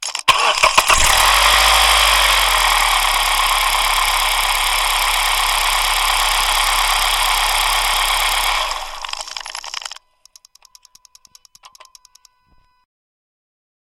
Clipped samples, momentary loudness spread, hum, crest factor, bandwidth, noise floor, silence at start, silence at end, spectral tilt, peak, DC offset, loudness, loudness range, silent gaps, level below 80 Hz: under 0.1%; 15 LU; none; 18 dB; 17 kHz; -56 dBFS; 0 s; 3.9 s; 1 dB/octave; 0 dBFS; under 0.1%; -13 LUFS; 15 LU; none; -30 dBFS